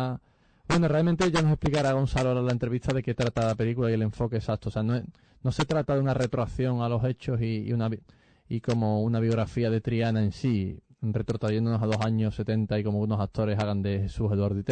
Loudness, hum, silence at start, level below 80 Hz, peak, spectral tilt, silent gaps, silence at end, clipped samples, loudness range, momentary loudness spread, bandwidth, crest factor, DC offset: -27 LUFS; none; 0 s; -46 dBFS; -14 dBFS; -7.5 dB/octave; none; 0 s; under 0.1%; 3 LU; 6 LU; 9.2 kHz; 12 dB; under 0.1%